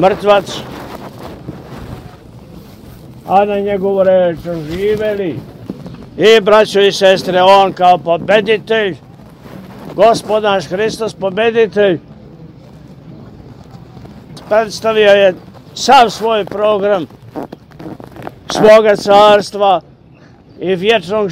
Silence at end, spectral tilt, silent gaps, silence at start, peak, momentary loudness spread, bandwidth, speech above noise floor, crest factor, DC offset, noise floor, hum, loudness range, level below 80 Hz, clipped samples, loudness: 0 s; -4.5 dB/octave; none; 0 s; 0 dBFS; 22 LU; 16 kHz; 31 dB; 12 dB; under 0.1%; -41 dBFS; none; 8 LU; -44 dBFS; 0.3%; -11 LUFS